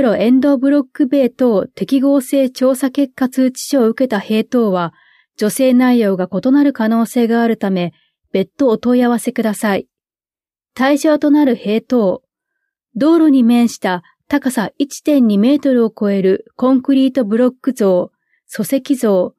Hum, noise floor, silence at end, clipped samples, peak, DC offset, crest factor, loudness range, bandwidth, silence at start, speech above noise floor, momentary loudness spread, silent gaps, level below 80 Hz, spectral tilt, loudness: none; under -90 dBFS; 0.1 s; under 0.1%; -2 dBFS; under 0.1%; 12 dB; 2 LU; 14.5 kHz; 0 s; over 76 dB; 8 LU; none; -62 dBFS; -6 dB/octave; -14 LUFS